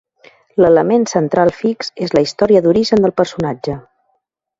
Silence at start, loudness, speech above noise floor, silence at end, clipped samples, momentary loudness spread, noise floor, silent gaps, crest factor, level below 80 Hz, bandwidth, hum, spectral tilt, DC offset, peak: 0.55 s; -14 LUFS; 53 dB; 0.8 s; under 0.1%; 11 LU; -67 dBFS; none; 14 dB; -48 dBFS; 7.8 kHz; none; -6 dB/octave; under 0.1%; 0 dBFS